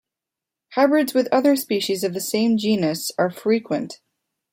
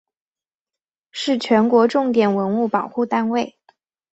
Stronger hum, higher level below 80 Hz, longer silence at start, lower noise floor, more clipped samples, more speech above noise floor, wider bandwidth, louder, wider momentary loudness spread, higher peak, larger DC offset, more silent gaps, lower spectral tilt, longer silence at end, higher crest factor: neither; about the same, -68 dBFS vs -66 dBFS; second, 0.7 s vs 1.15 s; second, -86 dBFS vs under -90 dBFS; neither; second, 66 dB vs over 72 dB; first, 16.5 kHz vs 8.2 kHz; about the same, -21 LUFS vs -19 LUFS; about the same, 8 LU vs 10 LU; second, -6 dBFS vs -2 dBFS; neither; neither; second, -4.5 dB/octave vs -6 dB/octave; about the same, 0.55 s vs 0.65 s; about the same, 16 dB vs 18 dB